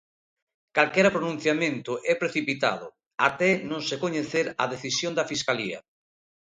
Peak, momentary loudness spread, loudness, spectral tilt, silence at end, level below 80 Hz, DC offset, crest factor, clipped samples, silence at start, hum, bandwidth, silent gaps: -4 dBFS; 8 LU; -26 LUFS; -4 dB/octave; 0.7 s; -68 dBFS; under 0.1%; 24 dB; under 0.1%; 0.75 s; none; 9.6 kHz; 3.06-3.11 s